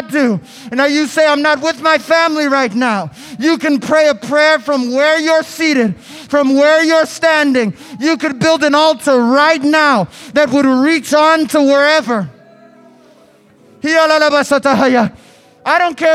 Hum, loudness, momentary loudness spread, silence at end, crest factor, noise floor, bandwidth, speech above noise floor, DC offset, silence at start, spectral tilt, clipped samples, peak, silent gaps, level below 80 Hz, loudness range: none; -12 LUFS; 8 LU; 0 s; 12 dB; -46 dBFS; 15 kHz; 34 dB; under 0.1%; 0 s; -4 dB/octave; under 0.1%; 0 dBFS; none; -58 dBFS; 3 LU